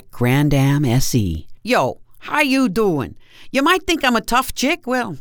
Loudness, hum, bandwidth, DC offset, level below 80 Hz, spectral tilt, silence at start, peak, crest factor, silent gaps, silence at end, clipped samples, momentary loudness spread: -18 LUFS; none; over 20 kHz; under 0.1%; -36 dBFS; -5 dB/octave; 0.15 s; -2 dBFS; 16 dB; none; 0 s; under 0.1%; 8 LU